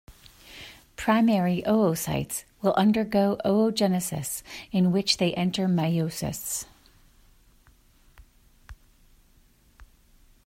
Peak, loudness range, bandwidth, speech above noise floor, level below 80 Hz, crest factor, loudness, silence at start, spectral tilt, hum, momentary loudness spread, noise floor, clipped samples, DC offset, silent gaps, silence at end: -6 dBFS; 10 LU; 16 kHz; 35 dB; -56 dBFS; 22 dB; -25 LUFS; 0.1 s; -5 dB/octave; none; 12 LU; -59 dBFS; under 0.1%; under 0.1%; none; 0.6 s